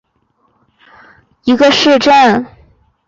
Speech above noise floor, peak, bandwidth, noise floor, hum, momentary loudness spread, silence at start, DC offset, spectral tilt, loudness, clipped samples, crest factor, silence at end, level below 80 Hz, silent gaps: 51 dB; -2 dBFS; 7.8 kHz; -59 dBFS; none; 12 LU; 1.45 s; under 0.1%; -3.5 dB/octave; -9 LUFS; under 0.1%; 12 dB; 0.6 s; -50 dBFS; none